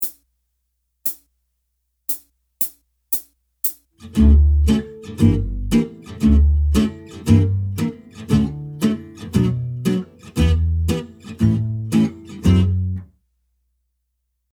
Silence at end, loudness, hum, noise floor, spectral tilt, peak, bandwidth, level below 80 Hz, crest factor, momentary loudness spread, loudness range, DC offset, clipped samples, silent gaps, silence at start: 1.5 s; -20 LUFS; none; -73 dBFS; -7 dB/octave; 0 dBFS; over 20 kHz; -24 dBFS; 18 dB; 11 LU; 8 LU; under 0.1%; under 0.1%; none; 0 s